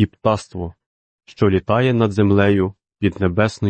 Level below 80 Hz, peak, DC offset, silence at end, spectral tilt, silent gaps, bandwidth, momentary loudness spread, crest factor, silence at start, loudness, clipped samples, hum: -46 dBFS; -4 dBFS; under 0.1%; 0 s; -7.5 dB/octave; 0.86-1.19 s; 8.8 kHz; 11 LU; 14 dB; 0 s; -18 LUFS; under 0.1%; none